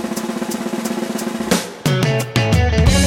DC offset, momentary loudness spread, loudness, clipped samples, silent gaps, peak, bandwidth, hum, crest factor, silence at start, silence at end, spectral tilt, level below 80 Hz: under 0.1%; 8 LU; -18 LUFS; under 0.1%; none; 0 dBFS; 17 kHz; none; 16 dB; 0 s; 0 s; -5 dB/octave; -26 dBFS